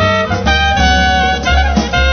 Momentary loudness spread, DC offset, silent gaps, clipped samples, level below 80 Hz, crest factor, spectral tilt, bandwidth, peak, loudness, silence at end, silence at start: 3 LU; under 0.1%; none; under 0.1%; -16 dBFS; 12 dB; -4.5 dB/octave; 6.6 kHz; 0 dBFS; -12 LUFS; 0 s; 0 s